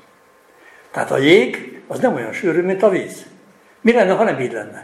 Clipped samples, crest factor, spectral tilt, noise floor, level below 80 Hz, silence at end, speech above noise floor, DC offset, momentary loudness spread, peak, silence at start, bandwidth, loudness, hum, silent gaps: under 0.1%; 18 dB; -5.5 dB/octave; -51 dBFS; -64 dBFS; 0 s; 35 dB; under 0.1%; 17 LU; 0 dBFS; 0.95 s; 13.5 kHz; -17 LUFS; none; none